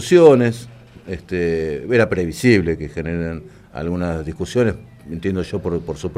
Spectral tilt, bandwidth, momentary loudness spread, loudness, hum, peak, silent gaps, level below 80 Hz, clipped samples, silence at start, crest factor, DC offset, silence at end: -6.5 dB/octave; 15 kHz; 18 LU; -19 LUFS; none; 0 dBFS; none; -44 dBFS; under 0.1%; 0 s; 18 dB; under 0.1%; 0 s